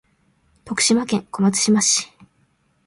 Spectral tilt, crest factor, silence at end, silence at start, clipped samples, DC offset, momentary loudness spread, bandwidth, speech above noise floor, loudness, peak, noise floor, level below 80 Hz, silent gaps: -3 dB/octave; 18 dB; 0.8 s; 0.65 s; under 0.1%; under 0.1%; 10 LU; 11.5 kHz; 45 dB; -18 LUFS; -4 dBFS; -63 dBFS; -60 dBFS; none